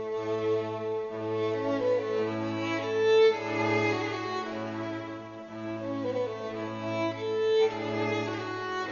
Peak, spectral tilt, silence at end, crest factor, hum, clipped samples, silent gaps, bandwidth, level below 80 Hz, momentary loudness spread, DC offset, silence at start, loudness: -12 dBFS; -6 dB/octave; 0 s; 16 dB; none; under 0.1%; none; 7.2 kHz; -68 dBFS; 11 LU; under 0.1%; 0 s; -30 LUFS